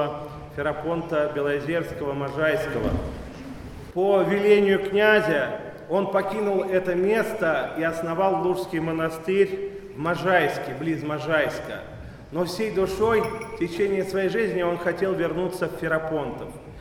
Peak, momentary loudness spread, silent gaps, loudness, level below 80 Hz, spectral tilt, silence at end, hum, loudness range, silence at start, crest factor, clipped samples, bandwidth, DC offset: -6 dBFS; 13 LU; none; -24 LUFS; -46 dBFS; -6 dB/octave; 0 s; none; 4 LU; 0 s; 18 dB; under 0.1%; 16.5 kHz; under 0.1%